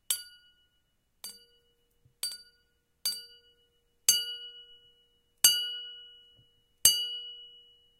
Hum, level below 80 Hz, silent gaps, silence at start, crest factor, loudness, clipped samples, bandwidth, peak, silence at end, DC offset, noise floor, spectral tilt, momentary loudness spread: none; -68 dBFS; none; 0.1 s; 30 dB; -27 LUFS; under 0.1%; 16.5 kHz; -4 dBFS; 0.5 s; under 0.1%; -74 dBFS; 3 dB/octave; 23 LU